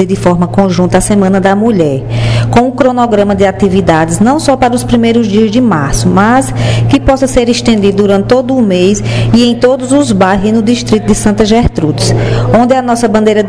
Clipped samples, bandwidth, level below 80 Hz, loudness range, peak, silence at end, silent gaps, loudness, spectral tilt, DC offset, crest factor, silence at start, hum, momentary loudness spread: 4%; 11 kHz; -26 dBFS; 0 LU; 0 dBFS; 0 s; none; -9 LUFS; -6 dB/octave; 1%; 8 dB; 0 s; none; 2 LU